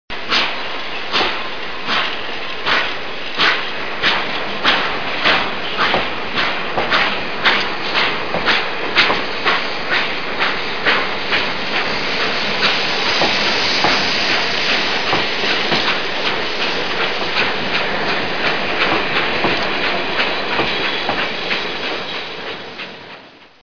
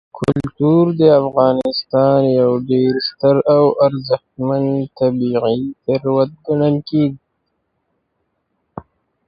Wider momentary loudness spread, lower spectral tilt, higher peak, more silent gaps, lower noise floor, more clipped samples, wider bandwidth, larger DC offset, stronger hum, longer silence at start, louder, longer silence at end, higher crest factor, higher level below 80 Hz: about the same, 8 LU vs 8 LU; second, -3 dB/octave vs -9 dB/octave; about the same, 0 dBFS vs 0 dBFS; neither; second, -40 dBFS vs -70 dBFS; neither; about the same, 5.4 kHz vs 5.6 kHz; first, 6% vs under 0.1%; neither; about the same, 0.05 s vs 0.15 s; about the same, -17 LUFS vs -16 LUFS; second, 0.1 s vs 0.45 s; about the same, 18 dB vs 16 dB; first, -46 dBFS vs -52 dBFS